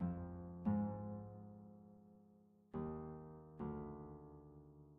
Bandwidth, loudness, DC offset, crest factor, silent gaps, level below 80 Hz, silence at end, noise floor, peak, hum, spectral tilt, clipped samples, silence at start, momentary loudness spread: 3.1 kHz; -48 LUFS; under 0.1%; 20 dB; none; -66 dBFS; 0 s; -69 dBFS; -28 dBFS; none; -9 dB/octave; under 0.1%; 0 s; 21 LU